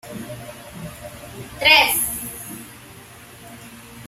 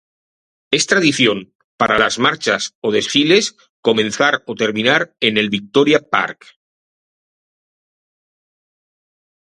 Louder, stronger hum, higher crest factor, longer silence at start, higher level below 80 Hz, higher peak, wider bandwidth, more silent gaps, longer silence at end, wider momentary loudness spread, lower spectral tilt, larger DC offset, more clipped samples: about the same, -16 LUFS vs -15 LUFS; neither; first, 24 dB vs 18 dB; second, 0.05 s vs 0.7 s; first, -50 dBFS vs -56 dBFS; about the same, -2 dBFS vs 0 dBFS; first, 16 kHz vs 11.5 kHz; second, none vs 1.55-1.78 s, 2.75-2.82 s, 3.70-3.83 s; second, 0 s vs 3.25 s; first, 28 LU vs 7 LU; second, -1 dB/octave vs -3 dB/octave; neither; neither